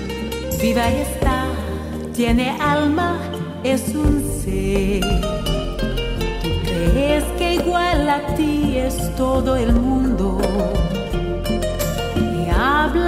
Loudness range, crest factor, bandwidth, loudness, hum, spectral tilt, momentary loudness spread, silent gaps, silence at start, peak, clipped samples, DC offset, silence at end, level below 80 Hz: 2 LU; 16 dB; 16 kHz; -20 LUFS; none; -5.5 dB/octave; 6 LU; none; 0 s; -4 dBFS; under 0.1%; under 0.1%; 0 s; -26 dBFS